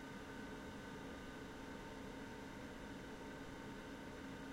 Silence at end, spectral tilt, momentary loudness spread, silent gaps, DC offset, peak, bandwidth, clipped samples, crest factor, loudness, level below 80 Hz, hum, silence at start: 0 s; -5 dB/octave; 1 LU; none; under 0.1%; -40 dBFS; 16 kHz; under 0.1%; 12 dB; -52 LUFS; -64 dBFS; none; 0 s